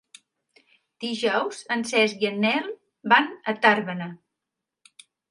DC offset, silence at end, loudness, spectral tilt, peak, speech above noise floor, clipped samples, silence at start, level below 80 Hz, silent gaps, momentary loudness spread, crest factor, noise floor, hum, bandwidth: under 0.1%; 1.15 s; -23 LUFS; -4 dB/octave; -2 dBFS; 62 dB; under 0.1%; 1 s; -78 dBFS; none; 15 LU; 22 dB; -85 dBFS; none; 11.5 kHz